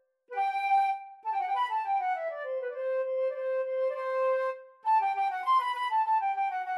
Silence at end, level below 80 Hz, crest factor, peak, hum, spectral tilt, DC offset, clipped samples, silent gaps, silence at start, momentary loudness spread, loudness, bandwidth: 0 s; under -90 dBFS; 12 dB; -18 dBFS; none; 1 dB/octave; under 0.1%; under 0.1%; none; 0.3 s; 8 LU; -30 LUFS; 12 kHz